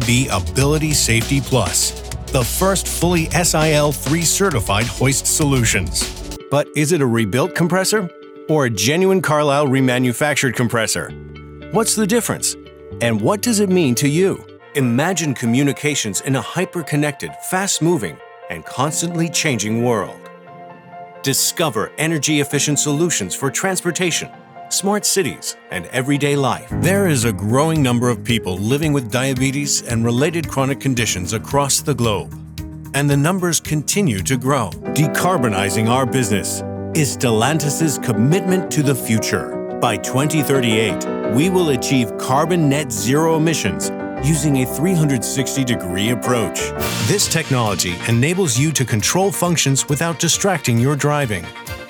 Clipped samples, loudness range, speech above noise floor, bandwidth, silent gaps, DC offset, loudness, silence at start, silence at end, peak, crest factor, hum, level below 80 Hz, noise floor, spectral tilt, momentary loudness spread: under 0.1%; 3 LU; 21 dB; over 20 kHz; none; under 0.1%; -17 LUFS; 0 s; 0 s; -2 dBFS; 14 dB; none; -38 dBFS; -38 dBFS; -4 dB/octave; 7 LU